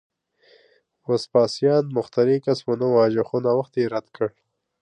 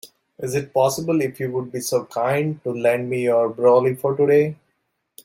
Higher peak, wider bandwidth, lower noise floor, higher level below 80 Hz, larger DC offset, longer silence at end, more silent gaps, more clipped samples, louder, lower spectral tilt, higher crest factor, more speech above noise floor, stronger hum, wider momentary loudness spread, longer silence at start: about the same, -6 dBFS vs -4 dBFS; second, 10 kHz vs 16.5 kHz; second, -60 dBFS vs -72 dBFS; about the same, -68 dBFS vs -64 dBFS; neither; second, 0.55 s vs 0.7 s; neither; neither; about the same, -22 LUFS vs -20 LUFS; about the same, -7 dB/octave vs -6 dB/octave; about the same, 16 dB vs 16 dB; second, 39 dB vs 53 dB; neither; about the same, 9 LU vs 9 LU; first, 1.1 s vs 0.05 s